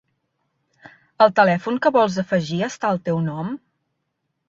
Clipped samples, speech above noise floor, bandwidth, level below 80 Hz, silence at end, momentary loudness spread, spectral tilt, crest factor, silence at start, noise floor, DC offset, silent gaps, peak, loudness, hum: under 0.1%; 56 dB; 7.8 kHz; -64 dBFS; 0.9 s; 12 LU; -6 dB/octave; 20 dB; 1.2 s; -75 dBFS; under 0.1%; none; -2 dBFS; -20 LUFS; none